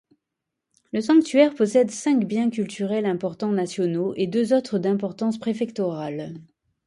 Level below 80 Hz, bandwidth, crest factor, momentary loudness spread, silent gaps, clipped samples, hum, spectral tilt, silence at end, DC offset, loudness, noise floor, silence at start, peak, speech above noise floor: -70 dBFS; 11.5 kHz; 18 dB; 10 LU; none; under 0.1%; none; -6 dB/octave; 0.45 s; under 0.1%; -23 LUFS; -83 dBFS; 0.95 s; -4 dBFS; 61 dB